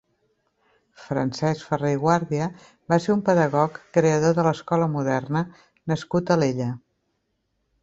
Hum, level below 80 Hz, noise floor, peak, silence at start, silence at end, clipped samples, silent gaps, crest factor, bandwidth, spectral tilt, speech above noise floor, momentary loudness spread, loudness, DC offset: none; -60 dBFS; -74 dBFS; -4 dBFS; 1 s; 1.05 s; under 0.1%; none; 20 dB; 8 kHz; -7 dB/octave; 51 dB; 9 LU; -23 LUFS; under 0.1%